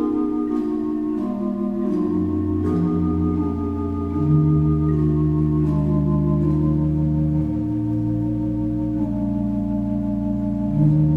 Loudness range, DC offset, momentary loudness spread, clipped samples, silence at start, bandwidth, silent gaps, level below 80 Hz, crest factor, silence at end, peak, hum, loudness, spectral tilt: 3 LU; under 0.1%; 5 LU; under 0.1%; 0 s; 3.3 kHz; none; -34 dBFS; 14 dB; 0 s; -6 dBFS; none; -21 LUFS; -11.5 dB/octave